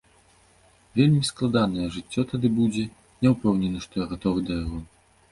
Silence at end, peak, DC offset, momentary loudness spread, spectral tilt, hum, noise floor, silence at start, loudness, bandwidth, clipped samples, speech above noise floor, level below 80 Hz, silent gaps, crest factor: 0.45 s; -6 dBFS; under 0.1%; 10 LU; -6.5 dB/octave; none; -58 dBFS; 0.95 s; -25 LUFS; 11.5 kHz; under 0.1%; 35 dB; -46 dBFS; none; 18 dB